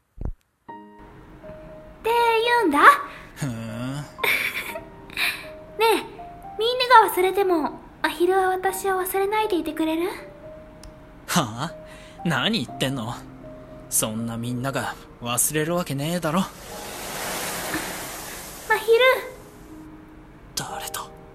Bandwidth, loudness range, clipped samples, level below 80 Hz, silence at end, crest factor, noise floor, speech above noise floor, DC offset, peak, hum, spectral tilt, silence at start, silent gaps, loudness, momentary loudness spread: 16.5 kHz; 6 LU; under 0.1%; -48 dBFS; 0 s; 24 dB; -45 dBFS; 23 dB; under 0.1%; 0 dBFS; none; -3.5 dB/octave; 0.15 s; none; -23 LUFS; 24 LU